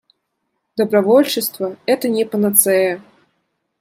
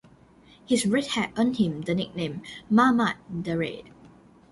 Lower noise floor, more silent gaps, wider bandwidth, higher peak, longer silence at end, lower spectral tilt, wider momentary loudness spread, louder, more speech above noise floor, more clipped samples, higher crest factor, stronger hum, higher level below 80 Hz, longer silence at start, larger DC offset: first, -72 dBFS vs -54 dBFS; neither; first, 16 kHz vs 11.5 kHz; first, 0 dBFS vs -6 dBFS; first, 0.8 s vs 0.45 s; second, -3.5 dB/octave vs -5 dB/octave; about the same, 11 LU vs 12 LU; first, -16 LUFS vs -25 LUFS; first, 57 dB vs 29 dB; neither; about the same, 18 dB vs 20 dB; neither; second, -68 dBFS vs -60 dBFS; about the same, 0.75 s vs 0.7 s; neither